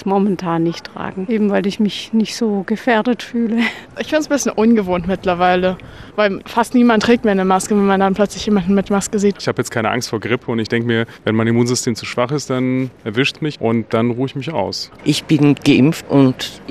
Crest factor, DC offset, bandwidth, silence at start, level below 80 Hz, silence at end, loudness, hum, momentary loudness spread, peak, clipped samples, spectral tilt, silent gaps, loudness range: 14 dB; 0.2%; 14.5 kHz; 0 s; -48 dBFS; 0 s; -17 LUFS; none; 7 LU; -2 dBFS; under 0.1%; -5.5 dB/octave; none; 3 LU